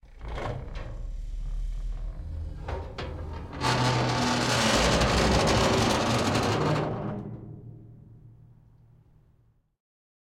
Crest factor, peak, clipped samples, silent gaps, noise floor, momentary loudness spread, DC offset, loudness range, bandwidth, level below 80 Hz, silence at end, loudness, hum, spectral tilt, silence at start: 18 dB; -12 dBFS; under 0.1%; none; -64 dBFS; 18 LU; under 0.1%; 14 LU; 16.5 kHz; -38 dBFS; 1.8 s; -26 LUFS; none; -4.5 dB/octave; 0.05 s